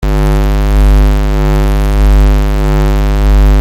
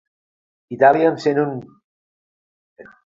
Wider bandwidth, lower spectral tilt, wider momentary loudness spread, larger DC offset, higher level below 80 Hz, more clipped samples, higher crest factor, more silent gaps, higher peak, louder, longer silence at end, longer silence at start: first, 15 kHz vs 7.6 kHz; about the same, -7 dB/octave vs -7 dB/octave; second, 3 LU vs 19 LU; neither; first, -8 dBFS vs -66 dBFS; neither; second, 6 dB vs 20 dB; second, none vs 1.84-2.76 s; about the same, -2 dBFS vs 0 dBFS; first, -11 LUFS vs -17 LUFS; second, 0 s vs 0.25 s; second, 0 s vs 0.7 s